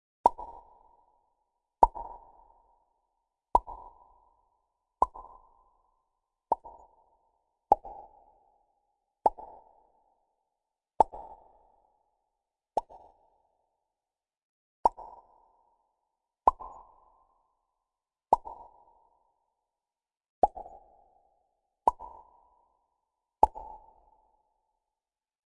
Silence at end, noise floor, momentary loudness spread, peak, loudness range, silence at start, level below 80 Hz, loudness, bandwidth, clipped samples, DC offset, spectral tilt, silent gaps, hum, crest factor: 1.85 s; under -90 dBFS; 23 LU; -4 dBFS; 6 LU; 0.25 s; -54 dBFS; -30 LUFS; 10.5 kHz; under 0.1%; under 0.1%; -6.5 dB/octave; 14.43-14.83 s, 20.30-20.42 s; none; 32 dB